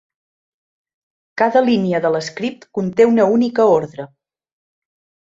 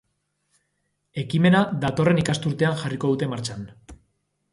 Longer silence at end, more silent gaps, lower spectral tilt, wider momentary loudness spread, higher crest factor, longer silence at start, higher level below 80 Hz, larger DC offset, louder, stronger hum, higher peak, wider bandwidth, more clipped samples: first, 1.15 s vs 0.55 s; neither; about the same, -6.5 dB/octave vs -6.5 dB/octave; about the same, 17 LU vs 15 LU; about the same, 16 dB vs 18 dB; first, 1.35 s vs 1.15 s; second, -62 dBFS vs -54 dBFS; neither; first, -16 LUFS vs -22 LUFS; second, none vs 50 Hz at -45 dBFS; first, -2 dBFS vs -6 dBFS; second, 7.6 kHz vs 11.5 kHz; neither